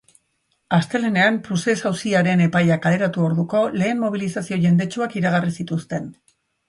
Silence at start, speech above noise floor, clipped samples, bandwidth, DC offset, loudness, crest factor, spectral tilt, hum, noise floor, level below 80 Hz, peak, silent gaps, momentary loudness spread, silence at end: 0.7 s; 50 dB; under 0.1%; 11.5 kHz; under 0.1%; -20 LUFS; 16 dB; -6.5 dB/octave; none; -69 dBFS; -60 dBFS; -4 dBFS; none; 8 LU; 0.55 s